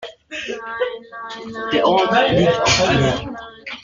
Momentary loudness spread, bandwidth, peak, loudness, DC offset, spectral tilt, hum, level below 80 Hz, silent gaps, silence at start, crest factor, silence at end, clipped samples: 17 LU; 9.4 kHz; -4 dBFS; -17 LUFS; under 0.1%; -4 dB/octave; none; -42 dBFS; none; 0 s; 16 dB; 0 s; under 0.1%